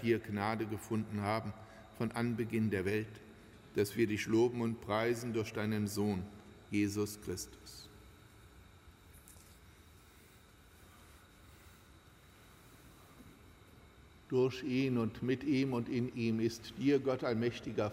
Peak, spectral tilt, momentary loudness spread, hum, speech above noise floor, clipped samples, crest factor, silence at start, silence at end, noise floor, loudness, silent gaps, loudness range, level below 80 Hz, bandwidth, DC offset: -18 dBFS; -6 dB/octave; 22 LU; none; 26 dB; under 0.1%; 18 dB; 0 s; 0 s; -61 dBFS; -36 LUFS; none; 8 LU; -64 dBFS; 16 kHz; under 0.1%